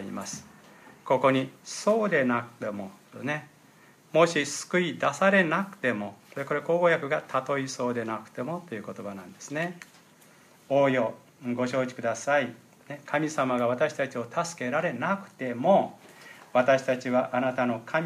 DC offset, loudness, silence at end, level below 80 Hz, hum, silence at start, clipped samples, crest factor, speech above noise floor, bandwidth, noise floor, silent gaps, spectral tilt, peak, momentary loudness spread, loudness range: under 0.1%; -27 LUFS; 0 s; -76 dBFS; none; 0 s; under 0.1%; 20 dB; 29 dB; 15 kHz; -56 dBFS; none; -5 dB/octave; -8 dBFS; 15 LU; 5 LU